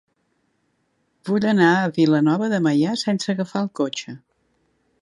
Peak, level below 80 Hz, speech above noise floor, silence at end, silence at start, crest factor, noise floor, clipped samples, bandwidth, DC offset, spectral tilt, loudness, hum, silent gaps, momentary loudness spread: -4 dBFS; -68 dBFS; 49 dB; 0.85 s; 1.25 s; 18 dB; -69 dBFS; under 0.1%; 11.5 kHz; under 0.1%; -6 dB/octave; -20 LUFS; none; none; 14 LU